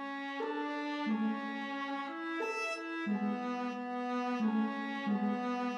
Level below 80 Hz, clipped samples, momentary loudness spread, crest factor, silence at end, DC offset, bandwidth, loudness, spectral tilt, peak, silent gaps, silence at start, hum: under -90 dBFS; under 0.1%; 5 LU; 12 dB; 0 s; under 0.1%; 10.5 kHz; -36 LUFS; -6 dB/octave; -22 dBFS; none; 0 s; none